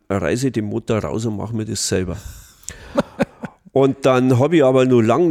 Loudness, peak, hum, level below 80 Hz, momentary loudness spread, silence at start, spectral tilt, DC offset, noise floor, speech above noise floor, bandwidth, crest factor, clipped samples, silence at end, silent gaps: -18 LUFS; -4 dBFS; none; -46 dBFS; 19 LU; 0.1 s; -6 dB/octave; under 0.1%; -37 dBFS; 21 dB; 15.5 kHz; 14 dB; under 0.1%; 0 s; none